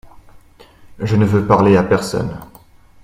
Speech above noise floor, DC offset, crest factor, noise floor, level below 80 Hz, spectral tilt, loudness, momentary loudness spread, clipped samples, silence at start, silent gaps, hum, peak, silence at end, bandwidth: 31 dB; under 0.1%; 18 dB; -45 dBFS; -42 dBFS; -7 dB/octave; -15 LUFS; 15 LU; under 0.1%; 0.05 s; none; none; 0 dBFS; 0.6 s; 16 kHz